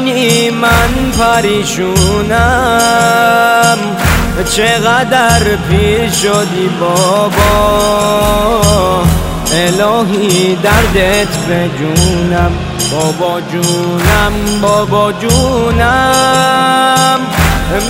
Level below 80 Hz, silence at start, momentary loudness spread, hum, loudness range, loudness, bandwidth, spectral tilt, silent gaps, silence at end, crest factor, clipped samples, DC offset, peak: -22 dBFS; 0 s; 4 LU; none; 2 LU; -10 LUFS; 16.5 kHz; -4 dB/octave; none; 0 s; 10 dB; under 0.1%; under 0.1%; 0 dBFS